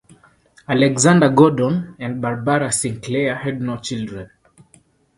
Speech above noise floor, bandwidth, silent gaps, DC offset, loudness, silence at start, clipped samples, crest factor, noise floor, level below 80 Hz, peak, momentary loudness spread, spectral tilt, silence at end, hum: 37 dB; 11.5 kHz; none; under 0.1%; -18 LUFS; 0.7 s; under 0.1%; 18 dB; -55 dBFS; -54 dBFS; 0 dBFS; 14 LU; -5 dB/octave; 0.9 s; none